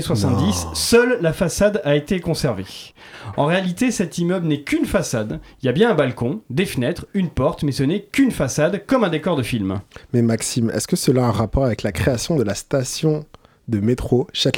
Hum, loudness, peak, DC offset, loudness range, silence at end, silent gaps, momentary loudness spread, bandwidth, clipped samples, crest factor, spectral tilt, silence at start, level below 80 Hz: none; -20 LUFS; -2 dBFS; under 0.1%; 2 LU; 0 s; none; 8 LU; 18.5 kHz; under 0.1%; 16 dB; -5.5 dB/octave; 0 s; -40 dBFS